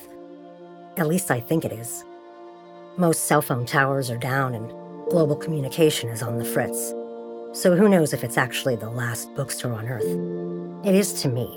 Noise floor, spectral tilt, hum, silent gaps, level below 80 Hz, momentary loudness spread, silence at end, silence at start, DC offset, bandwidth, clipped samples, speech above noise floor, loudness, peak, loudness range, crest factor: -43 dBFS; -5 dB/octave; none; none; -64 dBFS; 21 LU; 0 s; 0 s; under 0.1%; over 20 kHz; under 0.1%; 21 dB; -23 LUFS; -4 dBFS; 3 LU; 20 dB